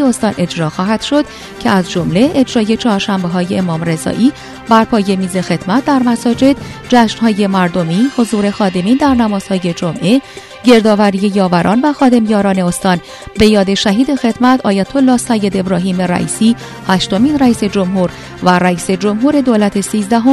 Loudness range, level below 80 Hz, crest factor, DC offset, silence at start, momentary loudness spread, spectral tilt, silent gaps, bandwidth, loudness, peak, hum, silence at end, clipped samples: 2 LU; -40 dBFS; 12 dB; under 0.1%; 0 s; 6 LU; -5.5 dB/octave; none; 13.5 kHz; -12 LUFS; 0 dBFS; none; 0 s; 0.2%